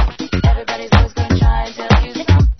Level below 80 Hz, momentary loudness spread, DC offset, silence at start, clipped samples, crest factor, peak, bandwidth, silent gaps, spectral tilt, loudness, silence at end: -18 dBFS; 5 LU; under 0.1%; 0 s; under 0.1%; 14 dB; 0 dBFS; 6.4 kHz; none; -6.5 dB/octave; -16 LUFS; 0.05 s